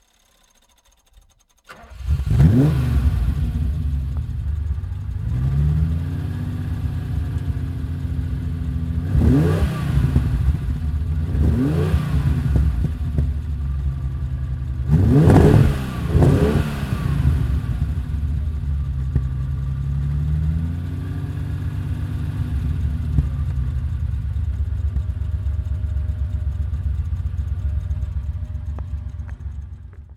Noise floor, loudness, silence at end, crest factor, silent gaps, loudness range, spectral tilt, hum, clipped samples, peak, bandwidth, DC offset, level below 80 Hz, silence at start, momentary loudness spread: -58 dBFS; -22 LUFS; 0 s; 20 dB; none; 8 LU; -9 dB/octave; none; under 0.1%; 0 dBFS; 13 kHz; under 0.1%; -24 dBFS; 1.7 s; 10 LU